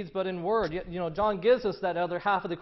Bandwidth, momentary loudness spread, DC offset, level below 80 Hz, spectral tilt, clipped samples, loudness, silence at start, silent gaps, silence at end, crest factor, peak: 6 kHz; 8 LU; under 0.1%; -54 dBFS; -8 dB/octave; under 0.1%; -28 LUFS; 0 s; none; 0 s; 16 dB; -12 dBFS